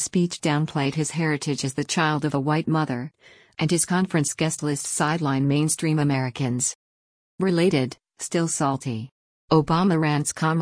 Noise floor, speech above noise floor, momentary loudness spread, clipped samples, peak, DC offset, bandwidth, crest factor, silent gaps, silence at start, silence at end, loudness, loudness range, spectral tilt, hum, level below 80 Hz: under -90 dBFS; over 67 dB; 8 LU; under 0.1%; -6 dBFS; under 0.1%; 10.5 kHz; 18 dB; 6.75-7.38 s, 9.12-9.48 s; 0 s; 0 s; -23 LUFS; 2 LU; -5 dB/octave; none; -58 dBFS